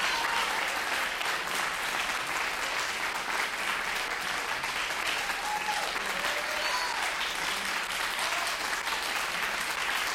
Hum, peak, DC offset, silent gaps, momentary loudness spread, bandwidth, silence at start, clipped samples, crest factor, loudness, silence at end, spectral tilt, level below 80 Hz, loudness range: none; -16 dBFS; under 0.1%; none; 2 LU; 16.5 kHz; 0 s; under 0.1%; 14 dB; -29 LUFS; 0 s; 0 dB/octave; -58 dBFS; 1 LU